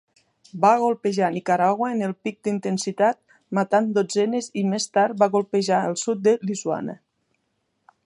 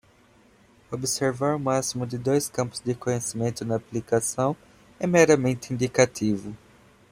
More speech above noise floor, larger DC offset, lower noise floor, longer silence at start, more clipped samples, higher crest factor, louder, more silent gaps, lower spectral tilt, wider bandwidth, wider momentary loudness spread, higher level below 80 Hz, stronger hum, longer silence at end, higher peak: first, 51 dB vs 33 dB; neither; first, -73 dBFS vs -57 dBFS; second, 0.55 s vs 0.9 s; neither; about the same, 18 dB vs 22 dB; first, -22 LUFS vs -25 LUFS; neither; about the same, -5 dB/octave vs -5 dB/octave; second, 11 kHz vs 16 kHz; about the same, 8 LU vs 10 LU; second, -72 dBFS vs -60 dBFS; neither; first, 1.1 s vs 0.55 s; about the same, -4 dBFS vs -4 dBFS